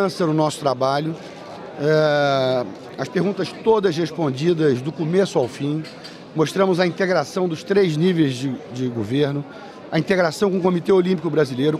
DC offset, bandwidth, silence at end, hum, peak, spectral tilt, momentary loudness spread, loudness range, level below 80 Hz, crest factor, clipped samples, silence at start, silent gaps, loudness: under 0.1%; 13.5 kHz; 0 s; none; -4 dBFS; -6.5 dB/octave; 11 LU; 1 LU; -62 dBFS; 16 dB; under 0.1%; 0 s; none; -20 LUFS